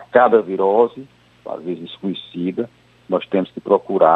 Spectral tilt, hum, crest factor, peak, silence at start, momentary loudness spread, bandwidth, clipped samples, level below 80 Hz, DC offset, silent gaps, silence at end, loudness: -8.5 dB/octave; none; 18 dB; -2 dBFS; 0 s; 16 LU; 4.4 kHz; under 0.1%; -66 dBFS; under 0.1%; none; 0 s; -19 LUFS